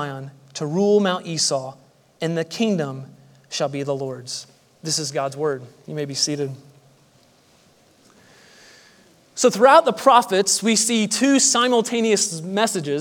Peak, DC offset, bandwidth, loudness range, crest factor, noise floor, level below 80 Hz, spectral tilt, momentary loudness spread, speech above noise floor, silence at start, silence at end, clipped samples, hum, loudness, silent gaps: 0 dBFS; under 0.1%; 18.5 kHz; 12 LU; 20 dB; -56 dBFS; -76 dBFS; -3 dB/octave; 17 LU; 36 dB; 0 s; 0 s; under 0.1%; none; -19 LUFS; none